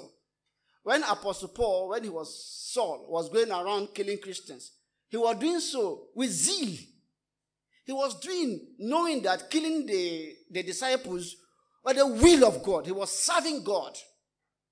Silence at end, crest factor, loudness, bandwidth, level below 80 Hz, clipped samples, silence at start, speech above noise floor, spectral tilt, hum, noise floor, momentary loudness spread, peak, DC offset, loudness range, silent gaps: 0.7 s; 24 dB; -28 LUFS; 10.5 kHz; -52 dBFS; under 0.1%; 0 s; 60 dB; -3 dB/octave; none; -88 dBFS; 13 LU; -6 dBFS; under 0.1%; 6 LU; none